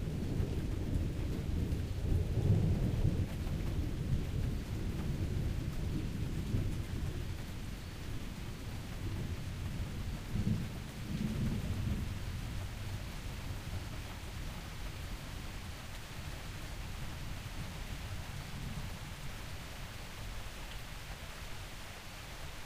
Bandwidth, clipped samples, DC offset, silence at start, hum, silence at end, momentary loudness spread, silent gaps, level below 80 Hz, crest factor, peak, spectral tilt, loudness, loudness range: 15.5 kHz; under 0.1%; under 0.1%; 0 s; none; 0 s; 10 LU; none; -42 dBFS; 18 dB; -20 dBFS; -6 dB/octave; -40 LUFS; 9 LU